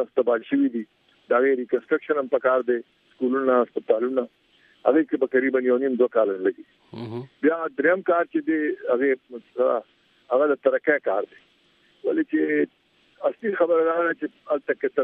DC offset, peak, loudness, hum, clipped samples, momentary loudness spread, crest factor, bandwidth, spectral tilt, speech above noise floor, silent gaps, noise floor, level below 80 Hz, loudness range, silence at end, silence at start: under 0.1%; -6 dBFS; -23 LUFS; none; under 0.1%; 9 LU; 18 dB; 4.5 kHz; -9 dB/octave; 39 dB; none; -61 dBFS; -80 dBFS; 2 LU; 0 s; 0 s